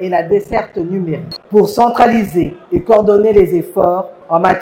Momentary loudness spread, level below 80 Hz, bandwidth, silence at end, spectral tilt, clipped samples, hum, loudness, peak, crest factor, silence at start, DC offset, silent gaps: 10 LU; -38 dBFS; 16.5 kHz; 0 s; -7 dB/octave; 0.2%; none; -13 LUFS; 0 dBFS; 12 dB; 0 s; under 0.1%; none